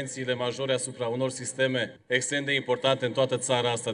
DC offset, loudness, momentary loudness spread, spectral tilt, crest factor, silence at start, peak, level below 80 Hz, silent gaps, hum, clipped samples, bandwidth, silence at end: under 0.1%; -27 LUFS; 5 LU; -3.5 dB/octave; 18 dB; 0 s; -10 dBFS; -74 dBFS; none; none; under 0.1%; 11 kHz; 0 s